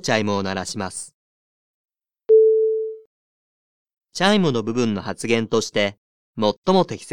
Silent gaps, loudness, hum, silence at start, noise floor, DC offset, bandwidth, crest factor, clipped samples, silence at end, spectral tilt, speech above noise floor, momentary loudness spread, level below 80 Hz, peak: 1.14-1.85 s, 3.06-3.86 s, 5.98-6.33 s, 6.58-6.63 s; -20 LUFS; none; 0.05 s; under -90 dBFS; 0.6%; 12 kHz; 20 dB; under 0.1%; 0 s; -5 dB/octave; over 69 dB; 17 LU; -58 dBFS; -2 dBFS